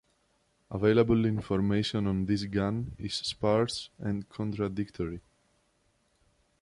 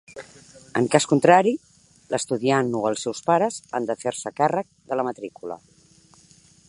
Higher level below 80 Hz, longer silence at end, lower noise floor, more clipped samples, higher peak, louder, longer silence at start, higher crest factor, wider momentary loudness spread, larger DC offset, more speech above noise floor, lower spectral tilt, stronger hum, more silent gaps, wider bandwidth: first, -52 dBFS vs -68 dBFS; first, 1.4 s vs 1.1 s; first, -71 dBFS vs -55 dBFS; neither; second, -12 dBFS vs -2 dBFS; second, -30 LUFS vs -22 LUFS; first, 0.7 s vs 0.1 s; about the same, 18 dB vs 22 dB; second, 11 LU vs 18 LU; neither; first, 42 dB vs 33 dB; first, -6.5 dB/octave vs -5 dB/octave; neither; neither; about the same, 11.5 kHz vs 11.5 kHz